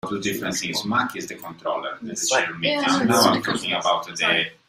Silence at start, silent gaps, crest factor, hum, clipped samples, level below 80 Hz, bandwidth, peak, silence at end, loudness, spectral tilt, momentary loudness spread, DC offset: 0.05 s; none; 18 dB; none; under 0.1%; -62 dBFS; 16 kHz; -4 dBFS; 0.15 s; -22 LUFS; -3 dB/octave; 11 LU; under 0.1%